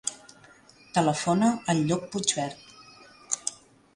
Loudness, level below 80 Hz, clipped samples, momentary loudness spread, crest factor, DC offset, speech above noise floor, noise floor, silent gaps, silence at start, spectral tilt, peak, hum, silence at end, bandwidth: -27 LUFS; -64 dBFS; under 0.1%; 11 LU; 24 dB; under 0.1%; 29 dB; -55 dBFS; none; 0.05 s; -4 dB/octave; -6 dBFS; none; 0.4 s; 11.5 kHz